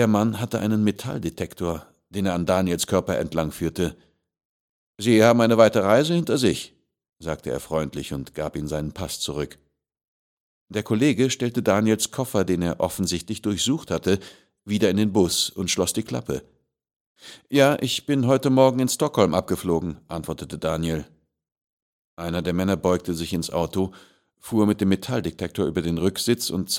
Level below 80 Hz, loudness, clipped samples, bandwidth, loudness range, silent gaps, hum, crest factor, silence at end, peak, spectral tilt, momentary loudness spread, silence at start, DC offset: -50 dBFS; -23 LUFS; under 0.1%; 17 kHz; 7 LU; 4.45-4.94 s, 10.08-10.68 s, 16.96-17.15 s, 21.61-22.17 s; none; 22 dB; 0 s; -2 dBFS; -5 dB/octave; 12 LU; 0 s; under 0.1%